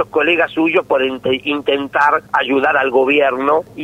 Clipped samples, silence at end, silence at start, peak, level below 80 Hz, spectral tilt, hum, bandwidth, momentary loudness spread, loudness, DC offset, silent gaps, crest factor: under 0.1%; 0 s; 0 s; -2 dBFS; -54 dBFS; -5.5 dB/octave; none; 13 kHz; 4 LU; -15 LUFS; under 0.1%; none; 14 dB